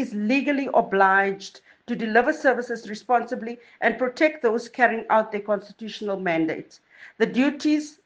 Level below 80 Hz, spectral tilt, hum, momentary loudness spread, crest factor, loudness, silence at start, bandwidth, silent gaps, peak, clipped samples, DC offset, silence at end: -68 dBFS; -5.5 dB/octave; none; 13 LU; 20 dB; -23 LUFS; 0 s; 9.4 kHz; none; -4 dBFS; under 0.1%; under 0.1%; 0.15 s